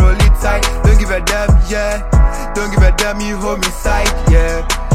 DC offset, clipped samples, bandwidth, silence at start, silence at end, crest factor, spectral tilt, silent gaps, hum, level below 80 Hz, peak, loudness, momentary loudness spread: under 0.1%; under 0.1%; 15 kHz; 0 s; 0 s; 12 dB; -5 dB/octave; none; none; -12 dBFS; 0 dBFS; -14 LUFS; 5 LU